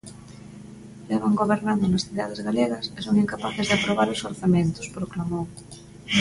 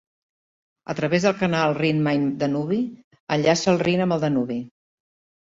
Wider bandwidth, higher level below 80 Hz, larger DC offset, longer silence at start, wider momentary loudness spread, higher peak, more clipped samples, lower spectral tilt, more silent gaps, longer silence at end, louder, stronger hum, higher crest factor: first, 11.5 kHz vs 7.8 kHz; first, -52 dBFS vs -60 dBFS; neither; second, 0.05 s vs 0.9 s; first, 21 LU vs 12 LU; about the same, -8 dBFS vs -6 dBFS; neither; about the same, -5.5 dB/octave vs -6 dB/octave; second, none vs 3.04-3.11 s, 3.20-3.27 s; second, 0 s vs 0.75 s; about the same, -24 LUFS vs -22 LUFS; neither; about the same, 16 dB vs 18 dB